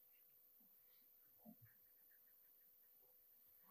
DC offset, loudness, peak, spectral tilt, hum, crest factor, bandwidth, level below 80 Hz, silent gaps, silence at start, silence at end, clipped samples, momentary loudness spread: under 0.1%; -68 LUFS; -50 dBFS; -5 dB/octave; none; 20 dB; 15.5 kHz; under -90 dBFS; none; 0 s; 0 s; under 0.1%; 3 LU